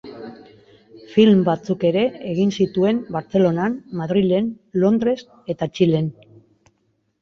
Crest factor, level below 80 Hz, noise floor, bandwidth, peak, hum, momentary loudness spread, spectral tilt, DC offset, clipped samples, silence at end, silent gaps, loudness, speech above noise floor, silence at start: 18 dB; -58 dBFS; -67 dBFS; 7 kHz; -2 dBFS; none; 12 LU; -8 dB/octave; under 0.1%; under 0.1%; 1.1 s; none; -20 LUFS; 49 dB; 0.05 s